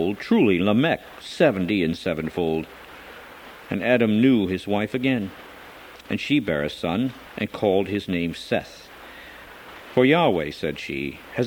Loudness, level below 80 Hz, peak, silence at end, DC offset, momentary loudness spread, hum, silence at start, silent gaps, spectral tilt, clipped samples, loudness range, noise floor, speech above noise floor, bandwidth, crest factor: -23 LUFS; -54 dBFS; -4 dBFS; 0 s; under 0.1%; 22 LU; none; 0 s; none; -6.5 dB/octave; under 0.1%; 3 LU; -43 dBFS; 21 dB; 19 kHz; 20 dB